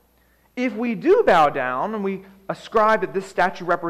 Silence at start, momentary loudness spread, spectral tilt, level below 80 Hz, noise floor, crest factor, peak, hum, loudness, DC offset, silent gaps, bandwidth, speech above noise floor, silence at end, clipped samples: 0.55 s; 16 LU; -6 dB/octave; -56 dBFS; -59 dBFS; 14 dB; -8 dBFS; none; -20 LUFS; under 0.1%; none; 14.5 kHz; 39 dB; 0 s; under 0.1%